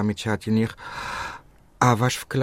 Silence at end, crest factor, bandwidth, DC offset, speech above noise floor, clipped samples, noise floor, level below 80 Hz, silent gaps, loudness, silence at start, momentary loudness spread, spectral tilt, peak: 0 s; 20 dB; 16 kHz; under 0.1%; 22 dB; under 0.1%; -45 dBFS; -52 dBFS; none; -24 LUFS; 0 s; 14 LU; -5.5 dB/octave; -4 dBFS